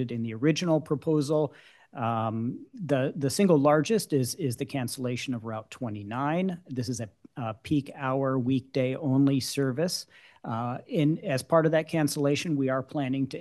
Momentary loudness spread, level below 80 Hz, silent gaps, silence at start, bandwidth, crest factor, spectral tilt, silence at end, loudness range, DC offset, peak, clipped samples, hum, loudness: 12 LU; -70 dBFS; none; 0 s; 12.5 kHz; 18 dB; -6 dB/octave; 0 s; 5 LU; under 0.1%; -10 dBFS; under 0.1%; none; -28 LUFS